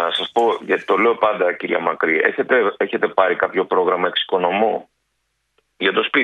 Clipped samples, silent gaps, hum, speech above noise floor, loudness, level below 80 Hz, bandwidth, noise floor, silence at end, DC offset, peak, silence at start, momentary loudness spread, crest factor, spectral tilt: under 0.1%; none; none; 53 dB; -18 LUFS; -66 dBFS; 8.8 kHz; -71 dBFS; 0 s; under 0.1%; 0 dBFS; 0 s; 4 LU; 18 dB; -5 dB/octave